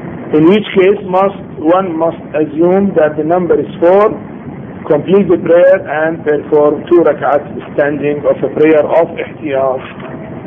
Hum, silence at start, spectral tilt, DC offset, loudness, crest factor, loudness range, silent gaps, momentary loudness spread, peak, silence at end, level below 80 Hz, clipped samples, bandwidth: none; 0 s; -9.5 dB/octave; under 0.1%; -11 LUFS; 12 dB; 2 LU; none; 11 LU; 0 dBFS; 0 s; -48 dBFS; under 0.1%; 3.8 kHz